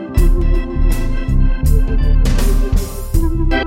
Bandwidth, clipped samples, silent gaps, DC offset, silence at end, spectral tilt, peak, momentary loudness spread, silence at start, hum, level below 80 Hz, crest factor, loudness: 16 kHz; under 0.1%; none; under 0.1%; 0 s; -6.5 dB/octave; -2 dBFS; 4 LU; 0 s; none; -12 dBFS; 10 dB; -18 LUFS